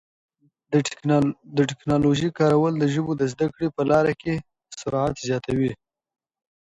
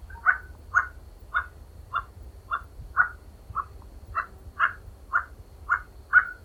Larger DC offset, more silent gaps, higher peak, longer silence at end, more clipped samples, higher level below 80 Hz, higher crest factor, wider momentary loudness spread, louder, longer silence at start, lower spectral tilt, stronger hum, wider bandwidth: neither; neither; about the same, -6 dBFS vs -6 dBFS; first, 0.95 s vs 0.1 s; neither; second, -52 dBFS vs -46 dBFS; second, 16 dB vs 24 dB; second, 8 LU vs 20 LU; first, -23 LUFS vs -28 LUFS; first, 0.7 s vs 0 s; first, -6.5 dB/octave vs -4 dB/octave; neither; second, 10.5 kHz vs 17.5 kHz